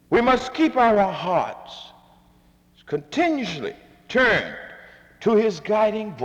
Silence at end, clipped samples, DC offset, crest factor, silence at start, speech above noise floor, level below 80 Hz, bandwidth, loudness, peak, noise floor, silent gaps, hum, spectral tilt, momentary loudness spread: 0 s; under 0.1%; under 0.1%; 16 dB; 0.1 s; 35 dB; -52 dBFS; 9.8 kHz; -21 LUFS; -6 dBFS; -56 dBFS; none; none; -5.5 dB/octave; 17 LU